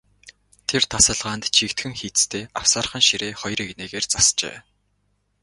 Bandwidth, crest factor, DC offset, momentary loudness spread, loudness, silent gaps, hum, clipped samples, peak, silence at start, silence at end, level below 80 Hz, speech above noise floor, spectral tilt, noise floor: 11.5 kHz; 22 dB; under 0.1%; 11 LU; -19 LUFS; none; 50 Hz at -55 dBFS; under 0.1%; -2 dBFS; 0.25 s; 0.85 s; -48 dBFS; 46 dB; -1 dB/octave; -68 dBFS